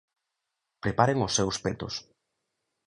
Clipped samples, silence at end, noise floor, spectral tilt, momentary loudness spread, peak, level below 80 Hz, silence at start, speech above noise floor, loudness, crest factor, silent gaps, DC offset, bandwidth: under 0.1%; 0.85 s; -84 dBFS; -4 dB/octave; 11 LU; -6 dBFS; -54 dBFS; 0.85 s; 57 dB; -28 LUFS; 24 dB; none; under 0.1%; 11 kHz